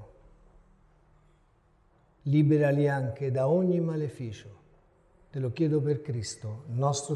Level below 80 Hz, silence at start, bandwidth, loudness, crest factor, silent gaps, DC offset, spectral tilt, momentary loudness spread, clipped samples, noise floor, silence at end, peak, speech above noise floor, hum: -62 dBFS; 0 s; 11 kHz; -28 LUFS; 16 dB; none; under 0.1%; -7 dB/octave; 15 LU; under 0.1%; -64 dBFS; 0 s; -14 dBFS; 37 dB; none